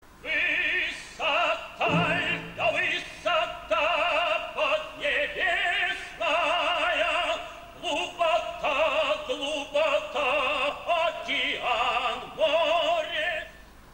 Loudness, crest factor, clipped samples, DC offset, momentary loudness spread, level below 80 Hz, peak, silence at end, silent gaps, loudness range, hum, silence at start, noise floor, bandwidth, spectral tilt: -26 LUFS; 14 dB; under 0.1%; under 0.1%; 6 LU; -54 dBFS; -14 dBFS; 0 s; none; 1 LU; none; 0.1 s; -48 dBFS; 16 kHz; -3.5 dB/octave